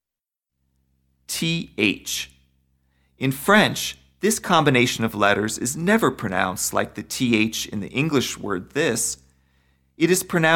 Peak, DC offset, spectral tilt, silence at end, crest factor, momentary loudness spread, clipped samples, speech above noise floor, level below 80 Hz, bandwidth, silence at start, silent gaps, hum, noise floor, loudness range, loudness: -4 dBFS; under 0.1%; -3.5 dB/octave; 0 s; 20 dB; 10 LU; under 0.1%; 67 dB; -54 dBFS; 18 kHz; 1.3 s; none; none; -88 dBFS; 4 LU; -21 LUFS